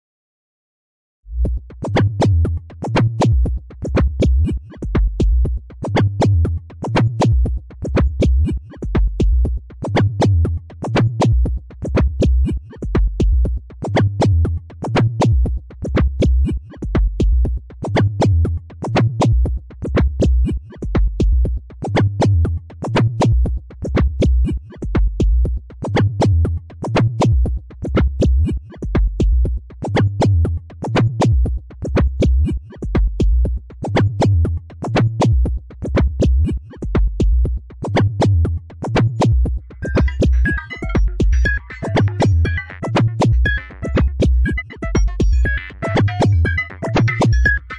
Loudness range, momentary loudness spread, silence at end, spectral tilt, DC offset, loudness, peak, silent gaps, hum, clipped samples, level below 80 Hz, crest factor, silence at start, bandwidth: 1 LU; 7 LU; 0 s; -7.5 dB/octave; under 0.1%; -18 LUFS; -4 dBFS; none; none; under 0.1%; -20 dBFS; 12 dB; 1.25 s; 9.4 kHz